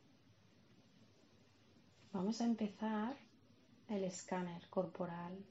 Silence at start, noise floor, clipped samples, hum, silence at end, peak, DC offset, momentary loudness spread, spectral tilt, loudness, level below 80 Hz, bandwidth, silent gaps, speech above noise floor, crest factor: 0.8 s; -69 dBFS; under 0.1%; none; 0.05 s; -24 dBFS; under 0.1%; 8 LU; -6 dB/octave; -43 LUFS; -88 dBFS; 7.6 kHz; none; 27 dB; 20 dB